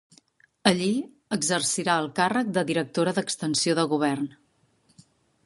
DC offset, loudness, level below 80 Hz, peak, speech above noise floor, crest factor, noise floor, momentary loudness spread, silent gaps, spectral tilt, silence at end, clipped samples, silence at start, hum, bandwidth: under 0.1%; -25 LUFS; -70 dBFS; -2 dBFS; 40 dB; 26 dB; -65 dBFS; 5 LU; none; -3.5 dB/octave; 1.15 s; under 0.1%; 0.65 s; none; 11.5 kHz